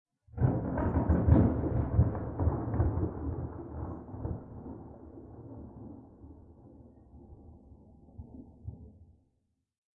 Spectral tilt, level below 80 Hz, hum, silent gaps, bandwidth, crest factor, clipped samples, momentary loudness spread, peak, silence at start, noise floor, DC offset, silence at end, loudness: -13.5 dB/octave; -42 dBFS; none; none; 2.6 kHz; 22 dB; under 0.1%; 24 LU; -12 dBFS; 0.35 s; -78 dBFS; under 0.1%; 0.9 s; -31 LUFS